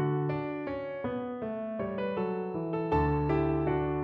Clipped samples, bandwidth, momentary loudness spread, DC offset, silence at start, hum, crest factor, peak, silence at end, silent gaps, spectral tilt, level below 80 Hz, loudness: under 0.1%; 5.4 kHz; 8 LU; under 0.1%; 0 s; none; 14 dB; -16 dBFS; 0 s; none; -10.5 dB/octave; -46 dBFS; -32 LUFS